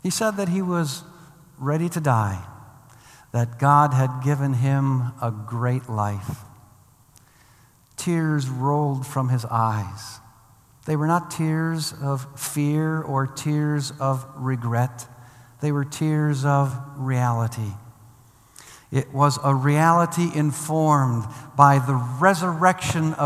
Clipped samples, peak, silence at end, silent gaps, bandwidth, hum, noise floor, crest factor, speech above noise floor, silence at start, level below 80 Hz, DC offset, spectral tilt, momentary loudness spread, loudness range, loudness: under 0.1%; 0 dBFS; 0 s; none; 15 kHz; none; -55 dBFS; 22 dB; 33 dB; 0.05 s; -62 dBFS; under 0.1%; -6 dB/octave; 12 LU; 7 LU; -22 LUFS